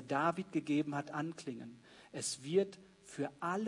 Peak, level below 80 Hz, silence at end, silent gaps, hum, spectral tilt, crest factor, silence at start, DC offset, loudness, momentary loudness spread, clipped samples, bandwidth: -18 dBFS; -80 dBFS; 0 s; none; none; -5 dB/octave; 20 dB; 0 s; under 0.1%; -38 LUFS; 16 LU; under 0.1%; 11 kHz